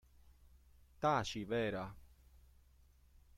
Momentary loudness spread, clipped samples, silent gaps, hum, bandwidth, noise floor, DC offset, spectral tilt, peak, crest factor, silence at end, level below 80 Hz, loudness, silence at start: 10 LU; under 0.1%; none; none; 16.5 kHz; -67 dBFS; under 0.1%; -5.5 dB/octave; -22 dBFS; 22 dB; 1 s; -64 dBFS; -39 LUFS; 1 s